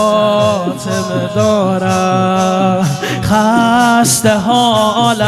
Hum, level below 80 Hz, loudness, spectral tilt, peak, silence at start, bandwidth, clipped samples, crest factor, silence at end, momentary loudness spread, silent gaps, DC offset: none; -44 dBFS; -12 LUFS; -4.5 dB/octave; 0 dBFS; 0 s; 15 kHz; under 0.1%; 12 dB; 0 s; 7 LU; none; under 0.1%